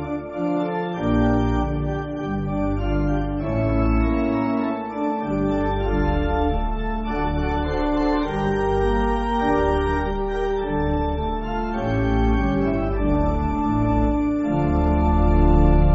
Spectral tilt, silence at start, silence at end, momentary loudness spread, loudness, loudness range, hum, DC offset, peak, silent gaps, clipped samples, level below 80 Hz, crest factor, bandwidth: -7 dB/octave; 0 s; 0 s; 6 LU; -22 LUFS; 2 LU; none; under 0.1%; -4 dBFS; none; under 0.1%; -26 dBFS; 16 dB; 7.8 kHz